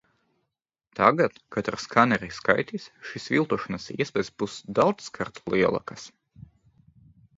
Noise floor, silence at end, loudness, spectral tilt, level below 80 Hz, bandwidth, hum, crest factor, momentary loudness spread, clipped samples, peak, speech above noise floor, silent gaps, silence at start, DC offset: -83 dBFS; 0.95 s; -25 LUFS; -5.5 dB/octave; -60 dBFS; 7.8 kHz; none; 24 dB; 16 LU; under 0.1%; -2 dBFS; 57 dB; none; 0.95 s; under 0.1%